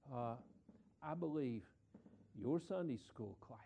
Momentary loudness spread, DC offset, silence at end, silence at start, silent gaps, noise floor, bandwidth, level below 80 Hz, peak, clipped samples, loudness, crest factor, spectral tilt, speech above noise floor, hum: 23 LU; under 0.1%; 0 s; 0.05 s; none; -68 dBFS; 9.6 kHz; -78 dBFS; -30 dBFS; under 0.1%; -46 LUFS; 18 dB; -8.5 dB/octave; 23 dB; none